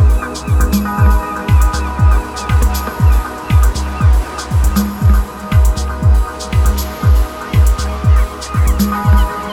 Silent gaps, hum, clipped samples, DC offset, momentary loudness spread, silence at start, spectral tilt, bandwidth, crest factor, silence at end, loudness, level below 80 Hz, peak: none; none; under 0.1%; under 0.1%; 4 LU; 0 s; -6 dB/octave; 16.5 kHz; 12 dB; 0 s; -14 LUFS; -14 dBFS; 0 dBFS